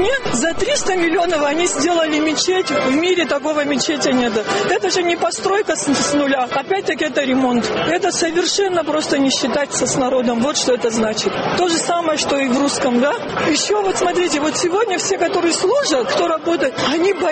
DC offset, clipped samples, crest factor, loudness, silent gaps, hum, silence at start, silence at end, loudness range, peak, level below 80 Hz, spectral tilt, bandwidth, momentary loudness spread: under 0.1%; under 0.1%; 12 dB; -17 LUFS; none; none; 0 s; 0 s; 1 LU; -4 dBFS; -48 dBFS; -2.5 dB/octave; 8.8 kHz; 2 LU